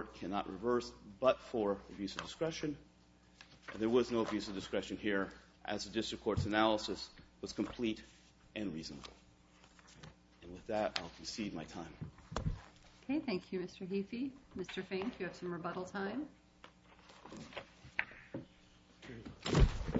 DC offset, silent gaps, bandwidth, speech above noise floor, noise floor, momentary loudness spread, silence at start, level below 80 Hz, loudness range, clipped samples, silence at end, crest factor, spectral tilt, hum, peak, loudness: under 0.1%; none; 7.6 kHz; 27 dB; -65 dBFS; 20 LU; 0 s; -50 dBFS; 7 LU; under 0.1%; 0 s; 26 dB; -4.5 dB/octave; none; -14 dBFS; -39 LUFS